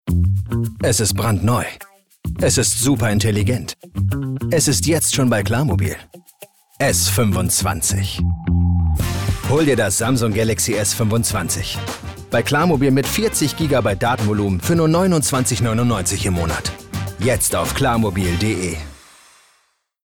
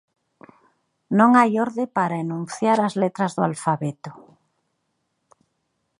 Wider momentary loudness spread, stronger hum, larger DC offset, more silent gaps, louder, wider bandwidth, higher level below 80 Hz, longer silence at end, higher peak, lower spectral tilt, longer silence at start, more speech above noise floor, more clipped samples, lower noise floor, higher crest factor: second, 9 LU vs 13 LU; neither; neither; neither; first, -18 LUFS vs -21 LUFS; first, 19.5 kHz vs 11.5 kHz; first, -36 dBFS vs -72 dBFS; second, 1.1 s vs 1.85 s; second, -8 dBFS vs -2 dBFS; second, -4.5 dB/octave vs -6.5 dB/octave; second, 0.05 s vs 1.1 s; second, 45 dB vs 53 dB; neither; second, -63 dBFS vs -74 dBFS; second, 10 dB vs 22 dB